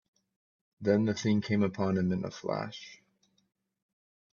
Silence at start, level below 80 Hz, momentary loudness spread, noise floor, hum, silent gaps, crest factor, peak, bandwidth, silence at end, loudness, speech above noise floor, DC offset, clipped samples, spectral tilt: 0.8 s; -70 dBFS; 12 LU; -72 dBFS; none; none; 20 dB; -14 dBFS; 7.2 kHz; 1.35 s; -30 LUFS; 43 dB; under 0.1%; under 0.1%; -6.5 dB/octave